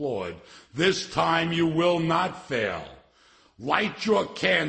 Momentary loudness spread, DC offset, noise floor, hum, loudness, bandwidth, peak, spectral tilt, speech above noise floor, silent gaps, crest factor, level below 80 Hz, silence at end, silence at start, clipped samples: 14 LU; under 0.1%; -59 dBFS; none; -25 LUFS; 8.8 kHz; -4 dBFS; -5 dB/octave; 34 dB; none; 22 dB; -58 dBFS; 0 s; 0 s; under 0.1%